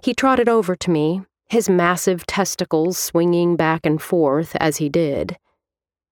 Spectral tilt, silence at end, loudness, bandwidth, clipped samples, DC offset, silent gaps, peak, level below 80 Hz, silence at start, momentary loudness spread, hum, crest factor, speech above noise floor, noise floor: -5 dB/octave; 0.75 s; -19 LUFS; 19 kHz; under 0.1%; under 0.1%; none; -4 dBFS; -52 dBFS; 0.05 s; 6 LU; none; 16 dB; 72 dB; -90 dBFS